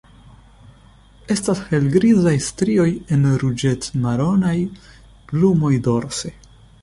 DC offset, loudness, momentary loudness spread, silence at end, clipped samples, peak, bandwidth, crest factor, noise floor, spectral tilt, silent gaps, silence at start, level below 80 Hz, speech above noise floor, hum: under 0.1%; -18 LUFS; 9 LU; 0.5 s; under 0.1%; -4 dBFS; 11.5 kHz; 16 dB; -48 dBFS; -6.5 dB/octave; none; 1.3 s; -44 dBFS; 30 dB; none